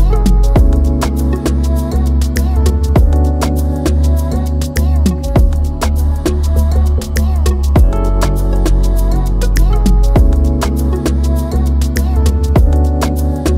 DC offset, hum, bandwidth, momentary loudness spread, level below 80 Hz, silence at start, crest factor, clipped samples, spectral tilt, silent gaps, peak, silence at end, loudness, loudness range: under 0.1%; none; 15.5 kHz; 4 LU; -12 dBFS; 0 s; 10 dB; under 0.1%; -7 dB/octave; none; 0 dBFS; 0 s; -14 LUFS; 1 LU